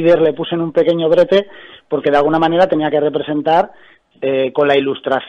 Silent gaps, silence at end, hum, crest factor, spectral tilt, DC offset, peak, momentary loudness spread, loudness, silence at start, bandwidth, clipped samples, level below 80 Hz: none; 0 s; none; 14 dB; -7.5 dB/octave; under 0.1%; 0 dBFS; 7 LU; -15 LUFS; 0 s; 6.8 kHz; under 0.1%; -54 dBFS